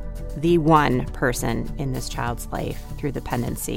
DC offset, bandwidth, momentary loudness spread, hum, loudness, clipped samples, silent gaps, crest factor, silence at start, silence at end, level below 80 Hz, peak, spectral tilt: under 0.1%; 17 kHz; 12 LU; none; -23 LUFS; under 0.1%; none; 20 dB; 0 s; 0 s; -34 dBFS; -4 dBFS; -5.5 dB/octave